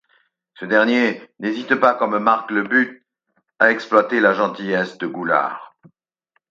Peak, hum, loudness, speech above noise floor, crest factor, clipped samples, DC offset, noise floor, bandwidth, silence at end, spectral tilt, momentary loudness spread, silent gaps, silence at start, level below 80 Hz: 0 dBFS; none; -18 LUFS; 51 dB; 20 dB; under 0.1%; under 0.1%; -69 dBFS; 7.6 kHz; 0.85 s; -6 dB/octave; 10 LU; none; 0.6 s; -72 dBFS